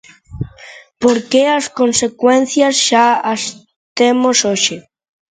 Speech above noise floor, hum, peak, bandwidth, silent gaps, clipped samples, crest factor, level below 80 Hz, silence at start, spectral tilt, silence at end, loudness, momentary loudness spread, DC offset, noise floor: 26 dB; none; 0 dBFS; 9.6 kHz; 3.76-3.96 s; under 0.1%; 14 dB; -48 dBFS; 0.3 s; -2.5 dB/octave; 0.5 s; -13 LUFS; 17 LU; under 0.1%; -39 dBFS